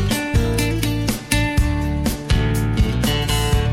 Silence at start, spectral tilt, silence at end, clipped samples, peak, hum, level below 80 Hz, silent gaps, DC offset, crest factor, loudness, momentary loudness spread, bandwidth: 0 s; -5 dB/octave; 0 s; under 0.1%; -2 dBFS; none; -24 dBFS; none; under 0.1%; 16 dB; -20 LUFS; 2 LU; 16.5 kHz